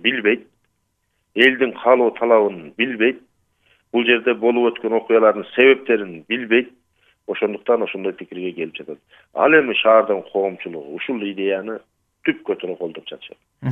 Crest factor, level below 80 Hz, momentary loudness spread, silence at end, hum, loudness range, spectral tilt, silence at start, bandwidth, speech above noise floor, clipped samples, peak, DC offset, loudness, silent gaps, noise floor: 20 dB; -70 dBFS; 17 LU; 0 s; none; 6 LU; -7 dB/octave; 0.05 s; 3.9 kHz; 51 dB; under 0.1%; 0 dBFS; under 0.1%; -18 LUFS; none; -70 dBFS